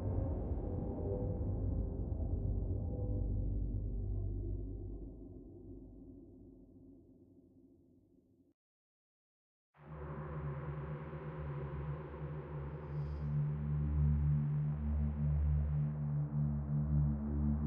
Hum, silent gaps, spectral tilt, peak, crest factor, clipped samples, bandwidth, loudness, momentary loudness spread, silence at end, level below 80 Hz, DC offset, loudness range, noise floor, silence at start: none; 8.54-9.73 s; -11.5 dB/octave; -24 dBFS; 14 dB; under 0.1%; 3.1 kHz; -39 LUFS; 19 LU; 0 s; -44 dBFS; under 0.1%; 18 LU; -69 dBFS; 0 s